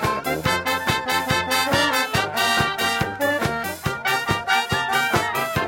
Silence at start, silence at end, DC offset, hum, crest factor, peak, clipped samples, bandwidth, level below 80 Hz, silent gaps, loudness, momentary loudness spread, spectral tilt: 0 s; 0 s; under 0.1%; none; 16 dB; -4 dBFS; under 0.1%; 17 kHz; -46 dBFS; none; -21 LUFS; 4 LU; -3.5 dB/octave